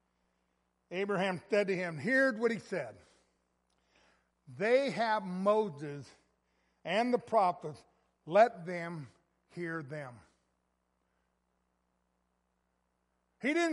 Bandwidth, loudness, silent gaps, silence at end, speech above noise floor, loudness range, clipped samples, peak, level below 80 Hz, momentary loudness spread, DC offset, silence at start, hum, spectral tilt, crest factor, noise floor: 11.5 kHz; -32 LUFS; none; 0 s; 47 dB; 14 LU; under 0.1%; -12 dBFS; -80 dBFS; 16 LU; under 0.1%; 0.9 s; none; -5.5 dB/octave; 22 dB; -80 dBFS